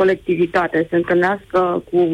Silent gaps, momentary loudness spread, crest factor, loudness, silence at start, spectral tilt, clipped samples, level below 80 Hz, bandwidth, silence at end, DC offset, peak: none; 2 LU; 10 dB; -18 LUFS; 0 s; -7.5 dB/octave; under 0.1%; -50 dBFS; 7.8 kHz; 0 s; under 0.1%; -8 dBFS